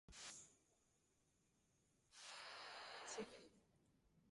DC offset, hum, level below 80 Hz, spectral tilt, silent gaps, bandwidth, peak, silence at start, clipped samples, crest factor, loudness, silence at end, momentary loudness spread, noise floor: under 0.1%; none; -84 dBFS; -1.5 dB/octave; none; 11.5 kHz; -40 dBFS; 0.1 s; under 0.1%; 20 dB; -56 LUFS; 0 s; 13 LU; -83 dBFS